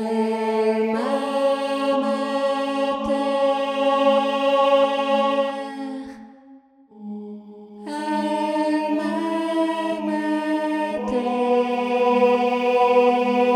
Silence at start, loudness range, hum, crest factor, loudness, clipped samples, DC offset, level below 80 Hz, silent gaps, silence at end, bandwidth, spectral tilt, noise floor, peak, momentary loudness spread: 0 s; 7 LU; none; 16 dB; -21 LUFS; under 0.1%; under 0.1%; -60 dBFS; none; 0 s; 13.5 kHz; -5 dB/octave; -49 dBFS; -6 dBFS; 14 LU